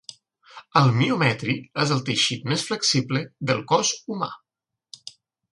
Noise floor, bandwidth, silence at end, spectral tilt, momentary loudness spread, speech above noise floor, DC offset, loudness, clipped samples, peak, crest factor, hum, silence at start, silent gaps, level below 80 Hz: -86 dBFS; 11.5 kHz; 0.4 s; -4 dB/octave; 19 LU; 64 dB; under 0.1%; -22 LUFS; under 0.1%; -2 dBFS; 22 dB; none; 0.1 s; none; -62 dBFS